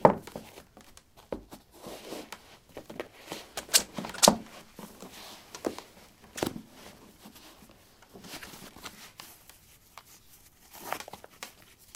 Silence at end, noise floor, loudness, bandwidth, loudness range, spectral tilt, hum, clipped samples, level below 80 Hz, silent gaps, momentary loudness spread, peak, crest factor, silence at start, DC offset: 0.45 s; -57 dBFS; -30 LUFS; 17.5 kHz; 19 LU; -2.5 dB/octave; none; under 0.1%; -62 dBFS; none; 27 LU; -2 dBFS; 34 dB; 0 s; under 0.1%